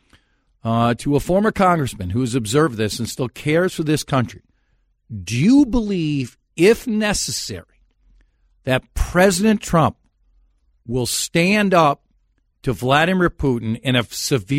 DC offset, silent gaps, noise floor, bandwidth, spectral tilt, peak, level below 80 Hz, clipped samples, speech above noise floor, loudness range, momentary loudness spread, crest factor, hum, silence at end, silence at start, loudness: under 0.1%; none; -63 dBFS; 16 kHz; -5 dB/octave; -2 dBFS; -36 dBFS; under 0.1%; 45 dB; 3 LU; 11 LU; 16 dB; none; 0 s; 0.65 s; -19 LUFS